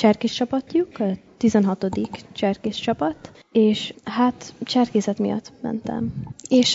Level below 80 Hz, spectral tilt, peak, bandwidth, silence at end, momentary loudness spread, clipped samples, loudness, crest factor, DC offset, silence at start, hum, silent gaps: -56 dBFS; -5.5 dB/octave; -4 dBFS; 8 kHz; 0 s; 10 LU; under 0.1%; -23 LUFS; 16 dB; under 0.1%; 0 s; none; none